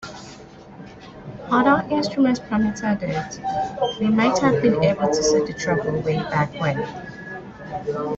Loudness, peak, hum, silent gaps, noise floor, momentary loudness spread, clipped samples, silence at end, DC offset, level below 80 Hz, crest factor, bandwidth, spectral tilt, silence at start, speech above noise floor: -21 LUFS; -6 dBFS; none; none; -42 dBFS; 20 LU; under 0.1%; 0 s; under 0.1%; -50 dBFS; 16 dB; 8 kHz; -5.5 dB/octave; 0 s; 21 dB